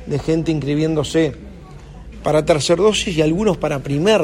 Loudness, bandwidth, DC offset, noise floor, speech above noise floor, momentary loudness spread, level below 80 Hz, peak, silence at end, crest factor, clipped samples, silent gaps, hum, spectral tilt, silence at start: -18 LUFS; 15.5 kHz; under 0.1%; -37 dBFS; 20 dB; 9 LU; -38 dBFS; -2 dBFS; 0 s; 16 dB; under 0.1%; none; none; -5.5 dB/octave; 0 s